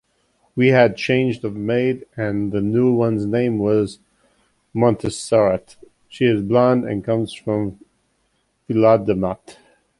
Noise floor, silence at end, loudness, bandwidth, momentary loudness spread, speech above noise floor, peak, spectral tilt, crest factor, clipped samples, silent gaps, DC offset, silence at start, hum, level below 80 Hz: -67 dBFS; 0.45 s; -19 LUFS; 11.5 kHz; 10 LU; 49 dB; -2 dBFS; -7 dB/octave; 18 dB; under 0.1%; none; under 0.1%; 0.55 s; none; -50 dBFS